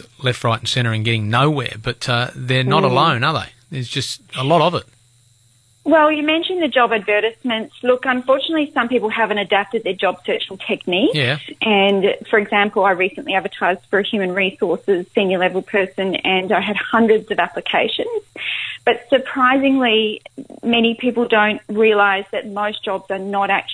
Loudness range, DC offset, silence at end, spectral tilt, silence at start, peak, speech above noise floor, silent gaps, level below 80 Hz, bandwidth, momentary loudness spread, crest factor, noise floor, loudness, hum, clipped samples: 2 LU; under 0.1%; 0 s; -5.5 dB/octave; 0.2 s; -2 dBFS; 37 dB; none; -56 dBFS; 11 kHz; 8 LU; 16 dB; -55 dBFS; -17 LUFS; none; under 0.1%